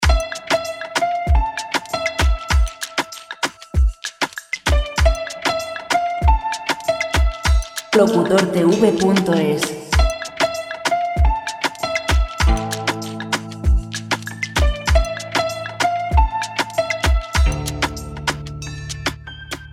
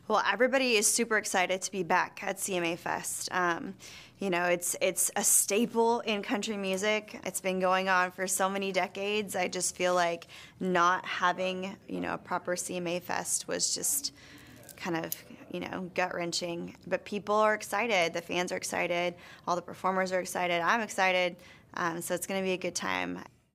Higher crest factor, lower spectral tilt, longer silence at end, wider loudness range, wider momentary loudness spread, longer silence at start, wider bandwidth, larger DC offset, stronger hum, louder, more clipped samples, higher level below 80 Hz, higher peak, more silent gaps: about the same, 18 dB vs 18 dB; first, -4.5 dB/octave vs -2.5 dB/octave; second, 0 s vs 0.3 s; about the same, 4 LU vs 5 LU; about the same, 9 LU vs 11 LU; about the same, 0 s vs 0.1 s; about the same, 15 kHz vs 16 kHz; neither; neither; first, -20 LUFS vs -30 LUFS; neither; first, -22 dBFS vs -70 dBFS; first, 0 dBFS vs -12 dBFS; neither